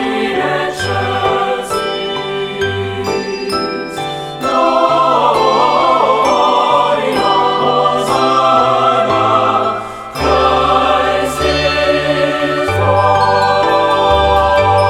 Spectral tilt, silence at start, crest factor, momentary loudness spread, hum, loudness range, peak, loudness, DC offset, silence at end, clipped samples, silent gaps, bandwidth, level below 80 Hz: -4.5 dB/octave; 0 s; 12 dB; 7 LU; none; 5 LU; 0 dBFS; -13 LUFS; under 0.1%; 0 s; under 0.1%; none; 15.5 kHz; -34 dBFS